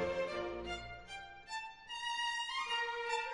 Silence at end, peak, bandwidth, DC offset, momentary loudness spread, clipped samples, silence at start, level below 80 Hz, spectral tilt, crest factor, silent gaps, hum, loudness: 0 s; -24 dBFS; 11.5 kHz; under 0.1%; 11 LU; under 0.1%; 0 s; -62 dBFS; -2.5 dB/octave; 16 dB; none; none; -40 LUFS